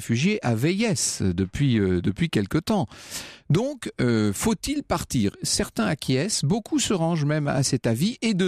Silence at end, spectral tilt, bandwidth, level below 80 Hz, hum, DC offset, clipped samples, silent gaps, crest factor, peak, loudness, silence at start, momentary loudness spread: 0 s; -5 dB/octave; 15 kHz; -48 dBFS; none; under 0.1%; under 0.1%; none; 12 dB; -12 dBFS; -24 LUFS; 0 s; 4 LU